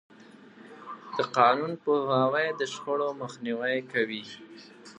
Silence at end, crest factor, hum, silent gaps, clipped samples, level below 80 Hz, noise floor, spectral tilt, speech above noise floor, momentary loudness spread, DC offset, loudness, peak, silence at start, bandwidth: 0.05 s; 24 dB; none; none; under 0.1%; -82 dBFS; -52 dBFS; -5 dB/octave; 24 dB; 21 LU; under 0.1%; -28 LUFS; -6 dBFS; 0.2 s; 10 kHz